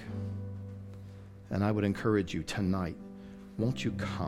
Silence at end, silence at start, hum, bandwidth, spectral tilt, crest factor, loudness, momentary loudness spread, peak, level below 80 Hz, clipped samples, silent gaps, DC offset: 0 s; 0 s; none; 13.5 kHz; -7 dB/octave; 18 dB; -33 LUFS; 18 LU; -16 dBFS; -56 dBFS; under 0.1%; none; under 0.1%